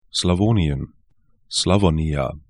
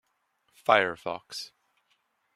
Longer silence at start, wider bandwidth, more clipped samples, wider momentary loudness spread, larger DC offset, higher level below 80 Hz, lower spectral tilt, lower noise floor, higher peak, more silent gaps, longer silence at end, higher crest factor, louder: second, 0.15 s vs 0.7 s; second, 11.5 kHz vs 14 kHz; neither; second, 9 LU vs 16 LU; first, 0.1% vs under 0.1%; first, -34 dBFS vs -76 dBFS; first, -5.5 dB/octave vs -3 dB/octave; second, -62 dBFS vs -74 dBFS; about the same, -2 dBFS vs -4 dBFS; neither; second, 0.1 s vs 0.9 s; second, 18 dB vs 26 dB; first, -20 LUFS vs -27 LUFS